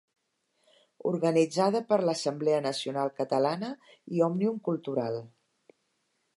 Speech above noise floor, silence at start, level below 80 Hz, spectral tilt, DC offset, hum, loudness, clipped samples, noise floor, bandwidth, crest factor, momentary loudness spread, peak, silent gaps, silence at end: 48 dB; 1.05 s; -82 dBFS; -6 dB/octave; under 0.1%; none; -29 LUFS; under 0.1%; -76 dBFS; 11.5 kHz; 18 dB; 10 LU; -12 dBFS; none; 1.1 s